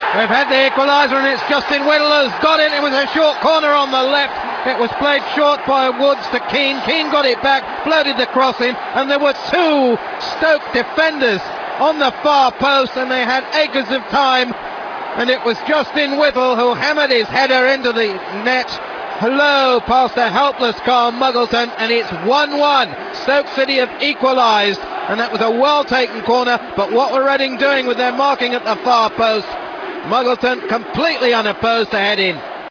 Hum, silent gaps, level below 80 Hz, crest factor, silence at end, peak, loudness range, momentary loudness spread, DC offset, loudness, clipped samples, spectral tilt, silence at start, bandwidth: none; none; -52 dBFS; 16 dB; 0 s; 0 dBFS; 2 LU; 6 LU; under 0.1%; -15 LUFS; under 0.1%; -4 dB/octave; 0 s; 5.4 kHz